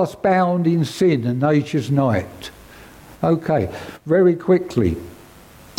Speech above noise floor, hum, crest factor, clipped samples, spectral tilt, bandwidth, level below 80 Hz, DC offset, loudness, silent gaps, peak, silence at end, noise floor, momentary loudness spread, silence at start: 26 dB; none; 14 dB; under 0.1%; -7.5 dB/octave; 16.5 kHz; -50 dBFS; under 0.1%; -19 LUFS; none; -4 dBFS; 0.65 s; -44 dBFS; 16 LU; 0 s